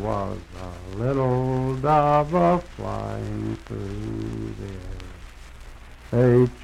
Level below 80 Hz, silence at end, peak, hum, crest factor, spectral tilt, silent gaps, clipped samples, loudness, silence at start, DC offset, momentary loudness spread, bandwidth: -40 dBFS; 0 s; -6 dBFS; none; 18 dB; -8.5 dB/octave; none; under 0.1%; -24 LUFS; 0 s; under 0.1%; 19 LU; 11 kHz